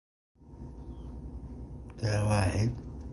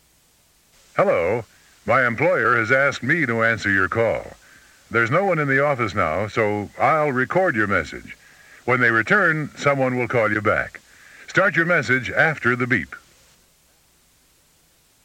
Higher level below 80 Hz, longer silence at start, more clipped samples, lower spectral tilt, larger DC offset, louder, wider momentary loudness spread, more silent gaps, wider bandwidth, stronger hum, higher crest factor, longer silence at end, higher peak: first, -44 dBFS vs -54 dBFS; second, 0.4 s vs 0.95 s; neither; about the same, -6.5 dB/octave vs -6 dB/octave; neither; second, -30 LUFS vs -19 LUFS; first, 18 LU vs 7 LU; neither; second, 11.5 kHz vs 16.5 kHz; neither; about the same, 18 dB vs 18 dB; second, 0 s vs 2.05 s; second, -16 dBFS vs -4 dBFS